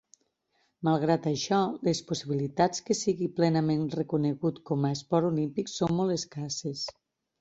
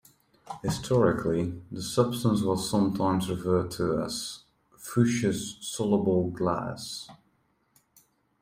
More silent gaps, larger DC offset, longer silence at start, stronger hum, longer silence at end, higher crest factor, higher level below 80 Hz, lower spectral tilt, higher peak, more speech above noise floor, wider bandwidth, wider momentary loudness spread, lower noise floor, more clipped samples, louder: neither; neither; first, 0.8 s vs 0.45 s; neither; second, 0.5 s vs 1.25 s; about the same, 18 dB vs 20 dB; second, -66 dBFS vs -56 dBFS; about the same, -5.5 dB/octave vs -6 dB/octave; about the same, -10 dBFS vs -8 dBFS; about the same, 46 dB vs 43 dB; second, 8.2 kHz vs 16 kHz; second, 7 LU vs 12 LU; first, -74 dBFS vs -70 dBFS; neither; about the same, -29 LUFS vs -28 LUFS